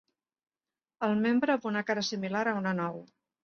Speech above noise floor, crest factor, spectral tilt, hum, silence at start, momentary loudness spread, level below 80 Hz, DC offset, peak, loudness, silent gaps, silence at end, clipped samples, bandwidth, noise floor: over 60 dB; 18 dB; -5.5 dB/octave; none; 1 s; 7 LU; -76 dBFS; under 0.1%; -14 dBFS; -30 LUFS; none; 0.4 s; under 0.1%; 7 kHz; under -90 dBFS